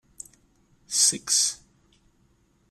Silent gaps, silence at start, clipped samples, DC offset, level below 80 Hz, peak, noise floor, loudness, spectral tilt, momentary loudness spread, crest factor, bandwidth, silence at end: none; 0.9 s; under 0.1%; under 0.1%; -66 dBFS; -6 dBFS; -64 dBFS; -21 LUFS; 1 dB/octave; 24 LU; 24 dB; 15.5 kHz; 1.15 s